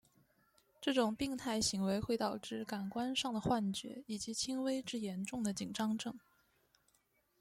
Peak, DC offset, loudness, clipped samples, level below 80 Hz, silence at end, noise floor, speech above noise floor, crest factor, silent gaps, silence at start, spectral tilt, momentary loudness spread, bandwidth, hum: -20 dBFS; under 0.1%; -38 LUFS; under 0.1%; -66 dBFS; 1.2 s; -77 dBFS; 39 dB; 20 dB; none; 0.8 s; -4 dB/octave; 8 LU; 16 kHz; none